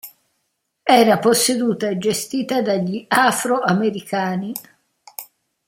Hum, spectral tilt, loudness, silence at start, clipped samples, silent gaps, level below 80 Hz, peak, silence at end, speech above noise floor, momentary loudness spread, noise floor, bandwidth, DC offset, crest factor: none; -4 dB/octave; -18 LUFS; 0.05 s; under 0.1%; none; -64 dBFS; -2 dBFS; 0.45 s; 55 dB; 17 LU; -73 dBFS; 16.5 kHz; under 0.1%; 18 dB